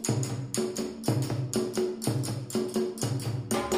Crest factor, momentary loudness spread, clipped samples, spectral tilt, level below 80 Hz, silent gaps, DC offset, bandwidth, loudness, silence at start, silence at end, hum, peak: 18 dB; 3 LU; under 0.1%; -5.5 dB/octave; -58 dBFS; none; under 0.1%; 16 kHz; -31 LUFS; 0 s; 0 s; none; -12 dBFS